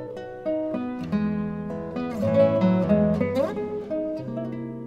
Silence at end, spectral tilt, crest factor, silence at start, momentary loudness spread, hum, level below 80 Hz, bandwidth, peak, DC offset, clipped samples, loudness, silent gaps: 0 s; -9 dB/octave; 16 dB; 0 s; 11 LU; none; -52 dBFS; 8 kHz; -8 dBFS; under 0.1%; under 0.1%; -25 LUFS; none